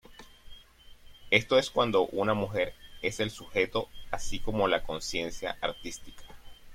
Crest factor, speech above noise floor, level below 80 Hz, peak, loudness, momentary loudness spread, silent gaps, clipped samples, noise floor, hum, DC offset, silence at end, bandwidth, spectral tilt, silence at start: 24 dB; 23 dB; -48 dBFS; -8 dBFS; -30 LUFS; 11 LU; none; under 0.1%; -53 dBFS; none; under 0.1%; 0 s; 16.5 kHz; -4 dB/octave; 0.1 s